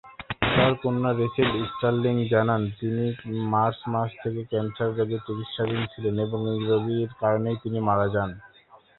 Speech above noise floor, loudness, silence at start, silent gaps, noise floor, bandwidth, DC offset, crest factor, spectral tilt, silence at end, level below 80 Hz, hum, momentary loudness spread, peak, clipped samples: 29 dB; -26 LUFS; 0.05 s; none; -55 dBFS; 4.2 kHz; under 0.1%; 20 dB; -11 dB/octave; 0.2 s; -52 dBFS; none; 7 LU; -6 dBFS; under 0.1%